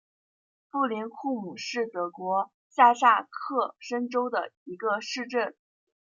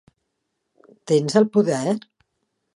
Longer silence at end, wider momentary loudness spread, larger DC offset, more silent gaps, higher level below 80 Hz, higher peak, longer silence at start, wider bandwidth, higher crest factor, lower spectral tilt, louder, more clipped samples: second, 0.6 s vs 0.8 s; first, 12 LU vs 8 LU; neither; first, 2.54-2.70 s, 4.57-4.66 s vs none; second, -88 dBFS vs -70 dBFS; second, -6 dBFS vs -2 dBFS; second, 0.75 s vs 1.05 s; second, 7.6 kHz vs 11.5 kHz; about the same, 22 dB vs 20 dB; second, -3.5 dB/octave vs -6 dB/octave; second, -27 LUFS vs -20 LUFS; neither